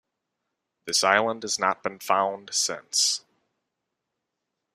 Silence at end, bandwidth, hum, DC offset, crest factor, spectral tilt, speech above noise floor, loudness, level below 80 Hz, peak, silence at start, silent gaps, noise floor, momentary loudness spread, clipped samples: 1.55 s; 15.5 kHz; none; under 0.1%; 26 dB; -0.5 dB/octave; 57 dB; -24 LUFS; -74 dBFS; -2 dBFS; 0.85 s; none; -83 dBFS; 8 LU; under 0.1%